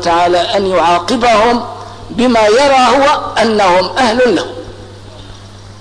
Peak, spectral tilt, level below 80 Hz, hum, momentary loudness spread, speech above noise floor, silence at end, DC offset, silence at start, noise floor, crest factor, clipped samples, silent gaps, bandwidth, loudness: -2 dBFS; -4 dB/octave; -38 dBFS; none; 15 LU; 22 dB; 0 s; under 0.1%; 0 s; -32 dBFS; 8 dB; under 0.1%; none; 11 kHz; -10 LUFS